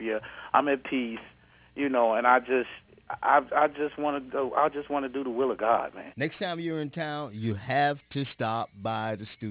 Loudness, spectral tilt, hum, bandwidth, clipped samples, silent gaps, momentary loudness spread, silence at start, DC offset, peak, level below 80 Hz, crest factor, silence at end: -28 LUFS; -9.5 dB/octave; none; 4 kHz; under 0.1%; none; 11 LU; 0 s; under 0.1%; -6 dBFS; -64 dBFS; 22 dB; 0 s